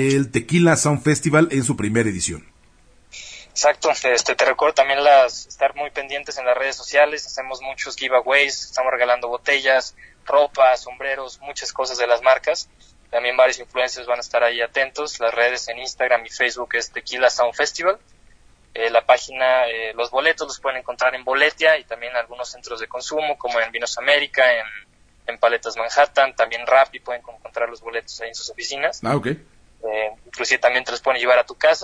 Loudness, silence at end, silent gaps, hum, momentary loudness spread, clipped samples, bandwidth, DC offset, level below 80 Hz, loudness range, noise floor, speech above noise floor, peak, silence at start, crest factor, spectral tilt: -19 LUFS; 0 s; none; none; 13 LU; under 0.1%; 10.5 kHz; under 0.1%; -54 dBFS; 3 LU; -53 dBFS; 33 dB; -2 dBFS; 0 s; 20 dB; -3.5 dB/octave